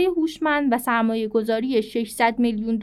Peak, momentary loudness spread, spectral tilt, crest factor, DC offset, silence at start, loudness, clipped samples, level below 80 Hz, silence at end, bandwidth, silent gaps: -8 dBFS; 3 LU; -5 dB/octave; 14 dB; under 0.1%; 0 s; -22 LUFS; under 0.1%; -54 dBFS; 0 s; 15 kHz; none